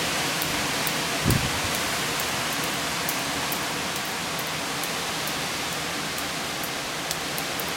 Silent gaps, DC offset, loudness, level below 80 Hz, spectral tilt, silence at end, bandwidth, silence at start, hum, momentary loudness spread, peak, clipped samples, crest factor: none; under 0.1%; -26 LUFS; -48 dBFS; -2.5 dB/octave; 0 s; 17 kHz; 0 s; none; 4 LU; -4 dBFS; under 0.1%; 24 dB